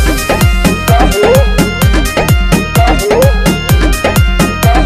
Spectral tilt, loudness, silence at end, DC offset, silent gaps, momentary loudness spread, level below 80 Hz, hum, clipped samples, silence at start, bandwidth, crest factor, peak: -5 dB/octave; -10 LUFS; 0 s; under 0.1%; none; 3 LU; -12 dBFS; none; 0.7%; 0 s; 16 kHz; 8 dB; 0 dBFS